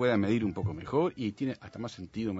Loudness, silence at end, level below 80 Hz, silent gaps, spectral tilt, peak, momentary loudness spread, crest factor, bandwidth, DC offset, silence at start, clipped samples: -32 LUFS; 0 s; -60 dBFS; none; -7.5 dB/octave; -14 dBFS; 12 LU; 16 dB; 8 kHz; under 0.1%; 0 s; under 0.1%